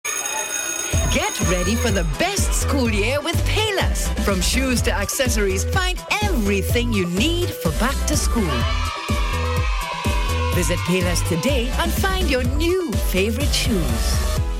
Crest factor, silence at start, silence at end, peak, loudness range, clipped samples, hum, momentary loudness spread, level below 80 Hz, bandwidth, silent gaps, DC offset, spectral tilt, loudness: 12 dB; 0.05 s; 0 s; -8 dBFS; 2 LU; under 0.1%; none; 3 LU; -24 dBFS; 17 kHz; none; under 0.1%; -4 dB/octave; -20 LUFS